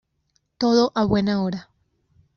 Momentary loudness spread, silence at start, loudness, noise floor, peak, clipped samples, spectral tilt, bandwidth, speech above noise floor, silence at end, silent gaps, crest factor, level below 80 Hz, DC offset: 9 LU; 0.6 s; -21 LUFS; -70 dBFS; -6 dBFS; under 0.1%; -5.5 dB/octave; 6.8 kHz; 50 dB; 0.75 s; none; 18 dB; -50 dBFS; under 0.1%